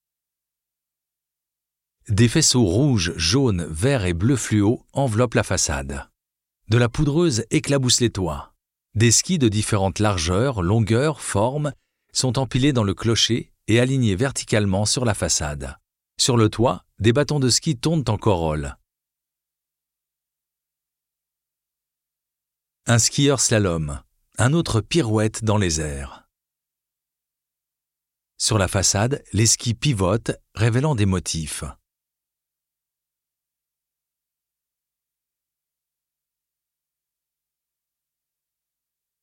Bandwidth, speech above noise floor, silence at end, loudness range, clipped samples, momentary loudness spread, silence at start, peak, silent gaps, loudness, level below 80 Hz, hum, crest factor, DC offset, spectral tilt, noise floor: 16.5 kHz; 67 dB; 7.5 s; 7 LU; under 0.1%; 10 LU; 2.05 s; -4 dBFS; none; -20 LUFS; -44 dBFS; none; 18 dB; under 0.1%; -4.5 dB/octave; -87 dBFS